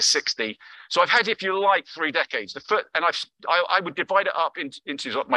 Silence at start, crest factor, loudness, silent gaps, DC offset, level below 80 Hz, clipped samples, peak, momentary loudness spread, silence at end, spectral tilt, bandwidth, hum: 0 s; 18 dB; -23 LUFS; none; under 0.1%; -74 dBFS; under 0.1%; -6 dBFS; 11 LU; 0 s; -1 dB/octave; 12.5 kHz; none